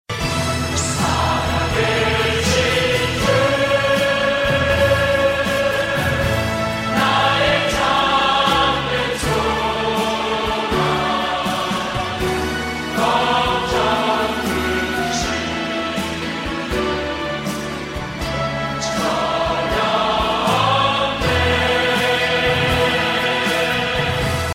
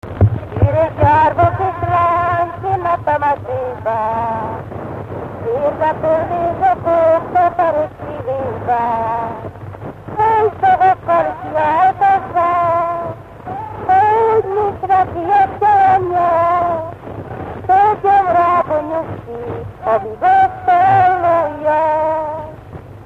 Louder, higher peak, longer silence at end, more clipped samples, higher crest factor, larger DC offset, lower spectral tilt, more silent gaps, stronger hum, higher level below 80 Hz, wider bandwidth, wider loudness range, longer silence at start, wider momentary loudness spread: second, -18 LUFS vs -15 LUFS; second, -4 dBFS vs 0 dBFS; about the same, 0 s vs 0 s; neither; about the same, 14 dB vs 14 dB; neither; second, -4 dB/octave vs -8.5 dB/octave; neither; neither; first, -34 dBFS vs -40 dBFS; first, 16.5 kHz vs 7.2 kHz; about the same, 5 LU vs 4 LU; about the same, 0.1 s vs 0.05 s; second, 6 LU vs 15 LU